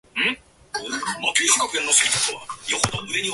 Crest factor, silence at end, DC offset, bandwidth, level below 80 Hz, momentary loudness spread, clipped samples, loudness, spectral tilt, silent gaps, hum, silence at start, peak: 22 dB; 0 s; under 0.1%; 12 kHz; -54 dBFS; 15 LU; under 0.1%; -20 LUFS; -0.5 dB/octave; none; none; 0.15 s; 0 dBFS